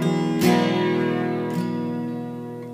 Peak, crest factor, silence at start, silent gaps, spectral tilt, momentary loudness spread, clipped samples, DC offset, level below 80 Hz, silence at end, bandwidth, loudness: -6 dBFS; 16 dB; 0 s; none; -6.5 dB/octave; 12 LU; under 0.1%; under 0.1%; -66 dBFS; 0 s; 15.5 kHz; -23 LUFS